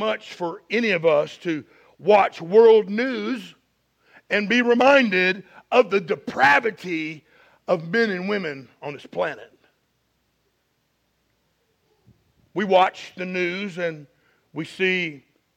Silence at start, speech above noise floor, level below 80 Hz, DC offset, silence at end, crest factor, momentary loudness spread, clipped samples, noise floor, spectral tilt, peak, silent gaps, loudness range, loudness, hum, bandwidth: 0 s; 49 dB; -70 dBFS; under 0.1%; 0.4 s; 20 dB; 17 LU; under 0.1%; -70 dBFS; -5.5 dB/octave; -2 dBFS; none; 13 LU; -21 LUFS; none; 9 kHz